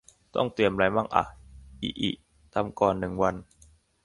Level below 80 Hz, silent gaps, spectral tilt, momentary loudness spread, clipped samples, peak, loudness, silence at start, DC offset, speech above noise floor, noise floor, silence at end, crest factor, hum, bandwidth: -52 dBFS; none; -6 dB/octave; 12 LU; under 0.1%; -6 dBFS; -28 LUFS; 0.35 s; under 0.1%; 33 dB; -59 dBFS; 0.6 s; 24 dB; none; 11.5 kHz